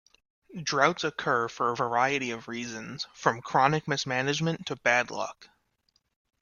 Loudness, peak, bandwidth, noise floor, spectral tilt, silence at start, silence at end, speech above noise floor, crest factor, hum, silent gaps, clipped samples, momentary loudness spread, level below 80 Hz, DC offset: -28 LUFS; -6 dBFS; 7.4 kHz; -73 dBFS; -4 dB/octave; 0.5 s; 0.95 s; 45 dB; 24 dB; none; none; under 0.1%; 11 LU; -68 dBFS; under 0.1%